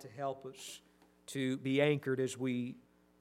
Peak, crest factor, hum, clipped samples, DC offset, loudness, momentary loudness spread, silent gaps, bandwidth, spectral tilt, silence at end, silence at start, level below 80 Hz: -16 dBFS; 20 dB; none; under 0.1%; under 0.1%; -36 LUFS; 19 LU; none; 15.5 kHz; -5.5 dB/octave; 0.4 s; 0 s; -80 dBFS